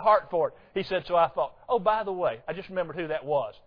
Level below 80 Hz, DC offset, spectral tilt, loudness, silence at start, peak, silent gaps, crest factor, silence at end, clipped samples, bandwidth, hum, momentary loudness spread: -58 dBFS; under 0.1%; -7.5 dB/octave; -28 LUFS; 0 s; -10 dBFS; none; 18 dB; 0.15 s; under 0.1%; 5.4 kHz; none; 8 LU